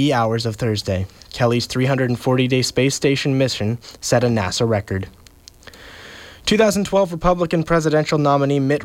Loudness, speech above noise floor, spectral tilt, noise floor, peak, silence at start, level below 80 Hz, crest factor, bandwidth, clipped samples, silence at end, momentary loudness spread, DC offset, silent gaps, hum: -19 LUFS; 26 dB; -5.5 dB/octave; -44 dBFS; -4 dBFS; 0 s; -42 dBFS; 16 dB; 16.5 kHz; under 0.1%; 0 s; 10 LU; under 0.1%; none; none